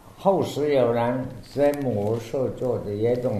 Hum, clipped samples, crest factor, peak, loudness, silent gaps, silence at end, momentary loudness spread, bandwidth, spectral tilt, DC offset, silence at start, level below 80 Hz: none; under 0.1%; 16 dB; -8 dBFS; -24 LUFS; none; 0 s; 6 LU; 13.5 kHz; -7 dB/octave; under 0.1%; 0.05 s; -50 dBFS